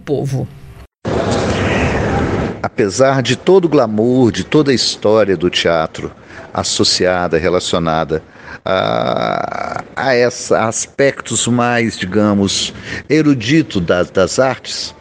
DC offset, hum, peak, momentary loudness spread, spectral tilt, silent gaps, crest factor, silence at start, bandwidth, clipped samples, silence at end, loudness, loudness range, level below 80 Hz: under 0.1%; none; 0 dBFS; 10 LU; -4.5 dB/octave; none; 14 dB; 0.05 s; 11 kHz; under 0.1%; 0.1 s; -14 LUFS; 3 LU; -36 dBFS